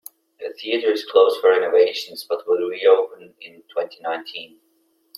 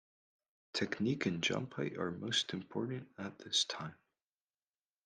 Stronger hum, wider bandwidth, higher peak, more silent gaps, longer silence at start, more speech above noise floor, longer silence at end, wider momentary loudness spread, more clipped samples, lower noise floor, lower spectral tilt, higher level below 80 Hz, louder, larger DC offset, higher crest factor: neither; first, 16 kHz vs 10 kHz; first, -2 dBFS vs -20 dBFS; neither; second, 0.4 s vs 0.75 s; second, 44 dB vs over 52 dB; second, 0.7 s vs 1.1 s; first, 18 LU vs 11 LU; neither; second, -64 dBFS vs under -90 dBFS; about the same, -3 dB/octave vs -3.5 dB/octave; about the same, -78 dBFS vs -76 dBFS; first, -20 LUFS vs -37 LUFS; neither; about the same, 18 dB vs 20 dB